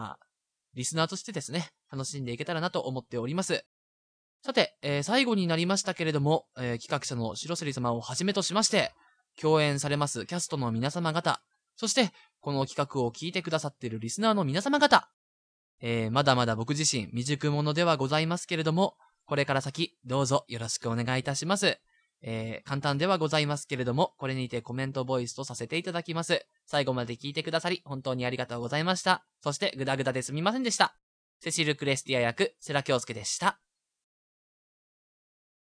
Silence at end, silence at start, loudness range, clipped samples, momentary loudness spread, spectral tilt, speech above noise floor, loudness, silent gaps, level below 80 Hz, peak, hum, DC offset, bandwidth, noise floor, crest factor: 2.1 s; 0 s; 4 LU; under 0.1%; 9 LU; -4 dB/octave; 52 dB; -29 LUFS; 3.66-4.40 s, 15.13-15.78 s, 31.03-31.40 s; -70 dBFS; -4 dBFS; none; under 0.1%; 11 kHz; -81 dBFS; 26 dB